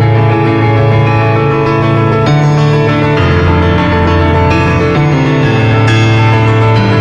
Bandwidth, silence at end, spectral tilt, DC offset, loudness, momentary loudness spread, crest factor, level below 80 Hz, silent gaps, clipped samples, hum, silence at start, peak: 7.6 kHz; 0 s; -7.5 dB/octave; under 0.1%; -9 LUFS; 2 LU; 8 dB; -26 dBFS; none; under 0.1%; none; 0 s; 0 dBFS